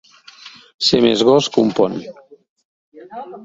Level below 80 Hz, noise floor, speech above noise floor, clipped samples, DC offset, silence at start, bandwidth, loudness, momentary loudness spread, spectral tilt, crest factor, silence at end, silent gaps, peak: -56 dBFS; -42 dBFS; 26 dB; under 0.1%; under 0.1%; 0.45 s; 8 kHz; -15 LUFS; 23 LU; -4.5 dB/octave; 18 dB; 0 s; 0.74-0.79 s, 2.49-2.56 s, 2.65-2.92 s; -2 dBFS